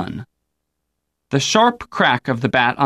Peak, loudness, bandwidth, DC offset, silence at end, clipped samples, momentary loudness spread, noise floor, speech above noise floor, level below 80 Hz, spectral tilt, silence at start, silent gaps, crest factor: -2 dBFS; -17 LUFS; 13.5 kHz; under 0.1%; 0 s; under 0.1%; 11 LU; -76 dBFS; 59 dB; -54 dBFS; -4 dB/octave; 0 s; none; 16 dB